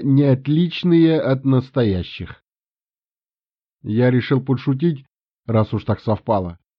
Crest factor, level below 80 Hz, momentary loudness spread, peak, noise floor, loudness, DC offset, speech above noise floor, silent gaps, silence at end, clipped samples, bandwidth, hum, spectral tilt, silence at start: 14 dB; -50 dBFS; 15 LU; -4 dBFS; under -90 dBFS; -19 LUFS; under 0.1%; over 72 dB; 2.47-2.51 s, 2.71-2.75 s, 2.82-2.86 s; 0.25 s; under 0.1%; 5.6 kHz; none; -7.5 dB/octave; 0 s